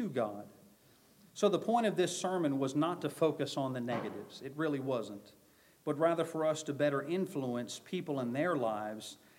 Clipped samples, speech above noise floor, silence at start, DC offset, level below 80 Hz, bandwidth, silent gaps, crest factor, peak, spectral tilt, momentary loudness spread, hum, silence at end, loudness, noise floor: under 0.1%; 30 dB; 0 s; under 0.1%; -84 dBFS; 16.5 kHz; none; 20 dB; -16 dBFS; -5.5 dB/octave; 12 LU; none; 0.25 s; -35 LUFS; -64 dBFS